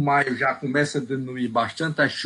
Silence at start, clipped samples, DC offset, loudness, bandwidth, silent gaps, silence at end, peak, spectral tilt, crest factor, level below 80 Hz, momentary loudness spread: 0 s; under 0.1%; under 0.1%; -24 LUFS; 11.5 kHz; none; 0 s; -8 dBFS; -5.5 dB/octave; 16 dB; -66 dBFS; 7 LU